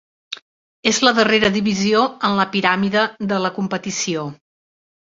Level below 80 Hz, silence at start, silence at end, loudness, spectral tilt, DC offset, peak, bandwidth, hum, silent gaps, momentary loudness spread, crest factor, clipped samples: -56 dBFS; 0.3 s; 0.7 s; -18 LUFS; -3.5 dB/octave; under 0.1%; -2 dBFS; 7.8 kHz; none; 0.42-0.83 s; 17 LU; 18 dB; under 0.1%